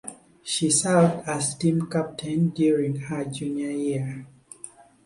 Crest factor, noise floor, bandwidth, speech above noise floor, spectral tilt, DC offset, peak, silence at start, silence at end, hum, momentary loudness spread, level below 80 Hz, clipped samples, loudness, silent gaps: 18 dB; -47 dBFS; 11.5 kHz; 23 dB; -5 dB/octave; under 0.1%; -6 dBFS; 0.05 s; 0.35 s; none; 20 LU; -62 dBFS; under 0.1%; -24 LUFS; none